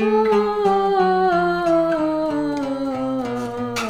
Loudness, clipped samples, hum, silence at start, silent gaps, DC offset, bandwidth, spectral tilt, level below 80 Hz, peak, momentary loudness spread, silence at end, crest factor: -20 LUFS; under 0.1%; none; 0 s; none; under 0.1%; 14 kHz; -6 dB/octave; -50 dBFS; -6 dBFS; 7 LU; 0 s; 12 dB